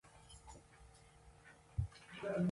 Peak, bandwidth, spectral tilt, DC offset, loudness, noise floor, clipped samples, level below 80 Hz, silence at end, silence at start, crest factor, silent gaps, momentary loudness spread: -26 dBFS; 11.5 kHz; -7 dB/octave; under 0.1%; -45 LUFS; -63 dBFS; under 0.1%; -56 dBFS; 0 s; 0.05 s; 18 dB; none; 20 LU